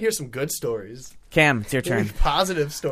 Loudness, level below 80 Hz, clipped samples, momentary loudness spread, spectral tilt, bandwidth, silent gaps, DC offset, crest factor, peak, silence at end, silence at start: -23 LUFS; -32 dBFS; under 0.1%; 12 LU; -4 dB/octave; 15.5 kHz; none; under 0.1%; 20 dB; -4 dBFS; 0 s; 0 s